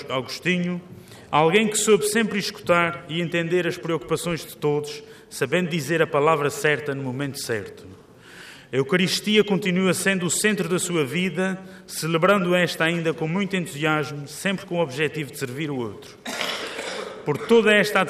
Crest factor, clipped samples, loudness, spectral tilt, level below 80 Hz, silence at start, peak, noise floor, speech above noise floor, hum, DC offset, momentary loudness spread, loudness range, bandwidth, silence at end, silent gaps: 18 dB; under 0.1%; -23 LUFS; -4 dB/octave; -62 dBFS; 0 s; -4 dBFS; -46 dBFS; 23 dB; none; under 0.1%; 12 LU; 4 LU; 15.5 kHz; 0 s; none